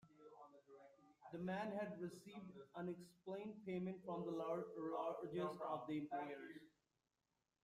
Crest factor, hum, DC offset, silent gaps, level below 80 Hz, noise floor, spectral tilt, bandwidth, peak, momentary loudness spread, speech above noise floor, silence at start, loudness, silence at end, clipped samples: 18 dB; none; under 0.1%; none; -86 dBFS; under -90 dBFS; -7.5 dB/octave; 15 kHz; -32 dBFS; 19 LU; over 42 dB; 0.05 s; -49 LUFS; 0.95 s; under 0.1%